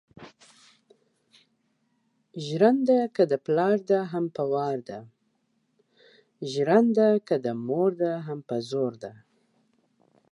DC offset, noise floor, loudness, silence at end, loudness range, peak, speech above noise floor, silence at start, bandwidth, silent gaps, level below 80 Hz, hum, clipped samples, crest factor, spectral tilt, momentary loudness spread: under 0.1%; -72 dBFS; -25 LUFS; 1.2 s; 4 LU; -8 dBFS; 48 dB; 0.2 s; 11 kHz; none; -78 dBFS; none; under 0.1%; 20 dB; -7 dB/octave; 17 LU